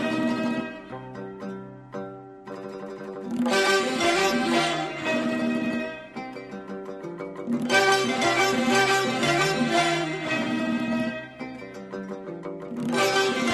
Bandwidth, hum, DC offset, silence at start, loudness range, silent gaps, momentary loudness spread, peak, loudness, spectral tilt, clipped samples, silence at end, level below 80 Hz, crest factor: 14 kHz; none; under 0.1%; 0 s; 7 LU; none; 16 LU; -8 dBFS; -24 LUFS; -3.5 dB/octave; under 0.1%; 0 s; -60 dBFS; 18 dB